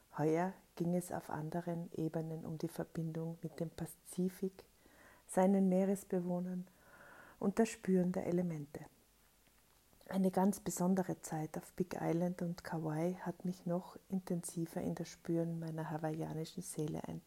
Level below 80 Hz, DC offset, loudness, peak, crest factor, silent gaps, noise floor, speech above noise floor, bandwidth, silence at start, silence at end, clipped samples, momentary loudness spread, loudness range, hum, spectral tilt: -72 dBFS; under 0.1%; -39 LUFS; -20 dBFS; 18 dB; none; -70 dBFS; 31 dB; 16 kHz; 0.15 s; 0.05 s; under 0.1%; 10 LU; 5 LU; none; -7 dB/octave